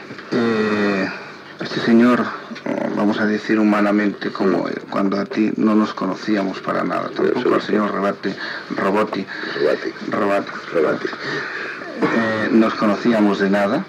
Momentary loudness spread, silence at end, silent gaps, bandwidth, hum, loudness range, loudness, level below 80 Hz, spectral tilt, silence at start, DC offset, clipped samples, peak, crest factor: 9 LU; 0 s; none; 9.2 kHz; none; 3 LU; -19 LUFS; -70 dBFS; -6.5 dB/octave; 0 s; under 0.1%; under 0.1%; -4 dBFS; 16 dB